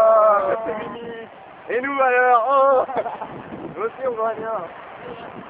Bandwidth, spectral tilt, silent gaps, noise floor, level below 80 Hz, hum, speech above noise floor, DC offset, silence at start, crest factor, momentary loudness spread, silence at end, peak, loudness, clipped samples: 4 kHz; -8.5 dB/octave; none; -39 dBFS; -62 dBFS; none; 18 dB; under 0.1%; 0 s; 16 dB; 20 LU; 0 s; -6 dBFS; -20 LUFS; under 0.1%